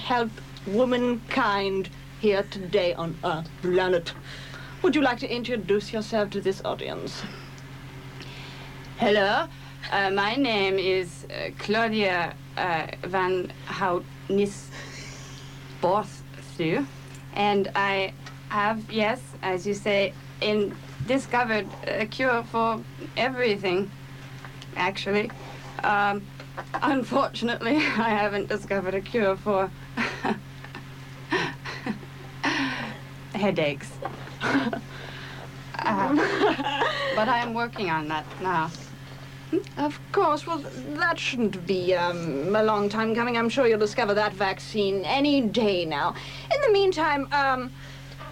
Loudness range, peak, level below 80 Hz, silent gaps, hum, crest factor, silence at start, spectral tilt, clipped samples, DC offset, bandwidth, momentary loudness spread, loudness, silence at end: 5 LU; -10 dBFS; -52 dBFS; none; none; 16 dB; 0 s; -5.5 dB/octave; under 0.1%; under 0.1%; 16.5 kHz; 16 LU; -26 LUFS; 0 s